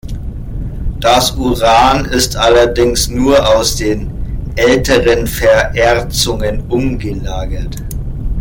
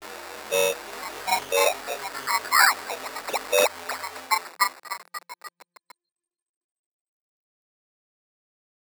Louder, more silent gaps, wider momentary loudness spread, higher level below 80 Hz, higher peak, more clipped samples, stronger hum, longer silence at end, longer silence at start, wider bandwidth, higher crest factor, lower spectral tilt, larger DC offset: first, -12 LUFS vs -24 LUFS; neither; second, 14 LU vs 18 LU; first, -22 dBFS vs -68 dBFS; about the same, 0 dBFS vs -2 dBFS; neither; neither; second, 0 s vs 3.5 s; about the same, 0.05 s vs 0 s; second, 17 kHz vs over 20 kHz; second, 12 dB vs 26 dB; first, -4 dB/octave vs 0.5 dB/octave; neither